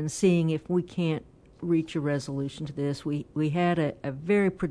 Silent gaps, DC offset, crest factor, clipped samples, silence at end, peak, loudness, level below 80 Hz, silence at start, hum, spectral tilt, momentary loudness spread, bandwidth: none; under 0.1%; 16 dB; under 0.1%; 0 s; -12 dBFS; -28 LUFS; -58 dBFS; 0 s; none; -6.5 dB/octave; 9 LU; 11 kHz